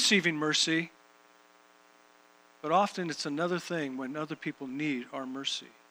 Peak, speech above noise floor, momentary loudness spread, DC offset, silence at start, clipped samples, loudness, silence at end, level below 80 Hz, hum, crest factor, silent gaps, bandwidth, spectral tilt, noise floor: -10 dBFS; 29 dB; 12 LU; under 0.1%; 0 s; under 0.1%; -31 LUFS; 0.25 s; -88 dBFS; none; 22 dB; none; over 20 kHz; -3 dB/octave; -61 dBFS